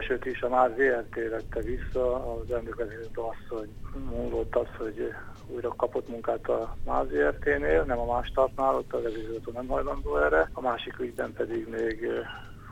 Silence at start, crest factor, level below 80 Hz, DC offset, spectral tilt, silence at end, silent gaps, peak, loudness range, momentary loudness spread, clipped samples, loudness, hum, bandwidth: 0 s; 20 dB; -40 dBFS; under 0.1%; -7 dB/octave; 0 s; none; -10 dBFS; 6 LU; 11 LU; under 0.1%; -30 LUFS; none; 16 kHz